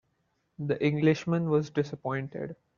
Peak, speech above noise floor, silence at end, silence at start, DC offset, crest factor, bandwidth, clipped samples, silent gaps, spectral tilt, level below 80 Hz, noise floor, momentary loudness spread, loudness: -10 dBFS; 47 dB; 0.25 s; 0.6 s; under 0.1%; 18 dB; 7.2 kHz; under 0.1%; none; -7 dB/octave; -66 dBFS; -75 dBFS; 13 LU; -29 LUFS